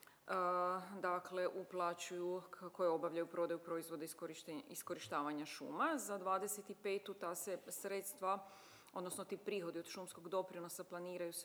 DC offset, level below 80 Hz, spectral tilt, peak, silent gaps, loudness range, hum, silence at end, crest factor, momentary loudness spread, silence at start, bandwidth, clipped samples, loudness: under 0.1%; under -90 dBFS; -3.5 dB/octave; -26 dBFS; none; 4 LU; none; 0 s; 16 dB; 9 LU; 0 s; over 20 kHz; under 0.1%; -44 LUFS